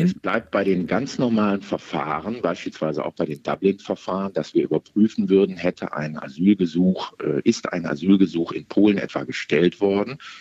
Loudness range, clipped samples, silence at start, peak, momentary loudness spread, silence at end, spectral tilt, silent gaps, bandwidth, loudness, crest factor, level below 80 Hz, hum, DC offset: 4 LU; under 0.1%; 0 s; -4 dBFS; 8 LU; 0 s; -7 dB/octave; none; 7.8 kHz; -22 LUFS; 18 dB; -60 dBFS; none; under 0.1%